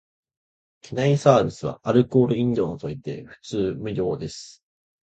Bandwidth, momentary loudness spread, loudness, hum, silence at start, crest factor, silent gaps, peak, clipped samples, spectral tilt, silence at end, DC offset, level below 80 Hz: 8.8 kHz; 16 LU; -23 LUFS; none; 0.85 s; 20 dB; none; -2 dBFS; under 0.1%; -7 dB/octave; 0.55 s; under 0.1%; -54 dBFS